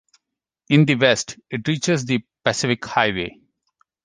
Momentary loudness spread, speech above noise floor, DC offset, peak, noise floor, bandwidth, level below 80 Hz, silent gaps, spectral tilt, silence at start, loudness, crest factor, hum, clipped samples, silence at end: 11 LU; 63 dB; under 0.1%; -2 dBFS; -83 dBFS; 10 kHz; -56 dBFS; none; -4.5 dB/octave; 0.7 s; -20 LUFS; 20 dB; none; under 0.1%; 0.75 s